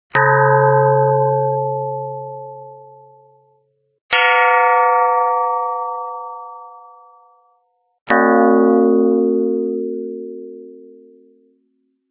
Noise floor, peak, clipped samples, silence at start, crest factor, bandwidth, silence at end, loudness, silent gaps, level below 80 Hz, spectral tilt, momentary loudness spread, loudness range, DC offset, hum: -65 dBFS; 0 dBFS; under 0.1%; 0.15 s; 18 dB; 4 kHz; 1.25 s; -15 LUFS; 4.01-4.09 s, 8.01-8.06 s; -68 dBFS; -10 dB/octave; 20 LU; 5 LU; under 0.1%; none